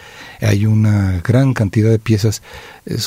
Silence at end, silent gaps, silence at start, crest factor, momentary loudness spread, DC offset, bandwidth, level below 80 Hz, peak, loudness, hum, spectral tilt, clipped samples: 0 s; none; 0.05 s; 14 dB; 16 LU; under 0.1%; 15 kHz; -42 dBFS; -2 dBFS; -15 LUFS; none; -6.5 dB/octave; under 0.1%